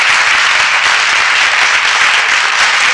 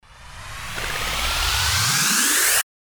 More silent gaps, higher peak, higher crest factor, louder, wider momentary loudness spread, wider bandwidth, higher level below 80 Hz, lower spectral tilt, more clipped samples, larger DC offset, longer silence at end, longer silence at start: neither; first, 0 dBFS vs -6 dBFS; second, 10 dB vs 16 dB; first, -8 LUFS vs -18 LUFS; second, 1 LU vs 17 LU; second, 11.5 kHz vs over 20 kHz; second, -50 dBFS vs -36 dBFS; second, 2 dB/octave vs -0.5 dB/octave; neither; neither; second, 0 s vs 0.2 s; about the same, 0 s vs 0.1 s